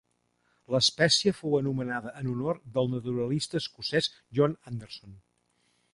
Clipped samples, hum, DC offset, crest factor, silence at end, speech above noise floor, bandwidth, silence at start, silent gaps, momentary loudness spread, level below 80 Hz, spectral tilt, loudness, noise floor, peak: under 0.1%; 60 Hz at -55 dBFS; under 0.1%; 20 dB; 0.75 s; 44 dB; 11.5 kHz; 0.7 s; none; 14 LU; -62 dBFS; -4.5 dB/octave; -28 LUFS; -73 dBFS; -10 dBFS